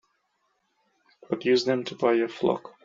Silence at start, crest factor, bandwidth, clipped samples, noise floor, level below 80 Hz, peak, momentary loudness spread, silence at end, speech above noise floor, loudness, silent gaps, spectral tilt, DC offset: 1.3 s; 20 dB; 7.6 kHz; under 0.1%; -73 dBFS; -72 dBFS; -8 dBFS; 5 LU; 0.15 s; 48 dB; -26 LUFS; none; -3.5 dB/octave; under 0.1%